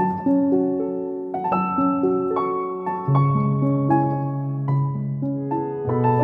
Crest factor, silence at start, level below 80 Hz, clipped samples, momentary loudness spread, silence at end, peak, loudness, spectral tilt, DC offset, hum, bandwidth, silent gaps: 14 dB; 0 s; -60 dBFS; under 0.1%; 7 LU; 0 s; -6 dBFS; -22 LUFS; -12 dB/octave; under 0.1%; none; 3.6 kHz; none